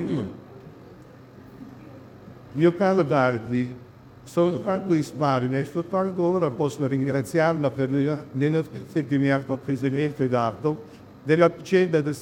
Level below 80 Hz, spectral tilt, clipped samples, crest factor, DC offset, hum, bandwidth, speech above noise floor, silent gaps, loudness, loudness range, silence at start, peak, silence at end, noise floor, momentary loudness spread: -62 dBFS; -7.5 dB/octave; under 0.1%; 18 dB; under 0.1%; none; 16.5 kHz; 23 dB; none; -24 LUFS; 2 LU; 0 s; -6 dBFS; 0 s; -46 dBFS; 14 LU